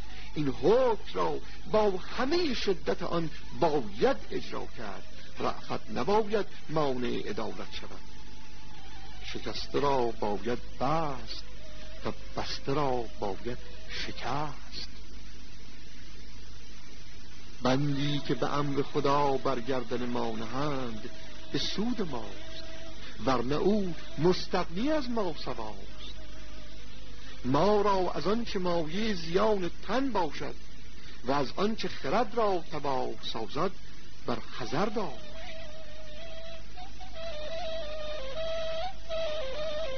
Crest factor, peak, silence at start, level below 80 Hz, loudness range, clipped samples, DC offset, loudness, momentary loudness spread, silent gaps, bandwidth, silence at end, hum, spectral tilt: 20 dB; -12 dBFS; 0 s; -50 dBFS; 8 LU; under 0.1%; 4%; -32 LUFS; 20 LU; none; 6.6 kHz; 0 s; 50 Hz at -50 dBFS; -5.5 dB/octave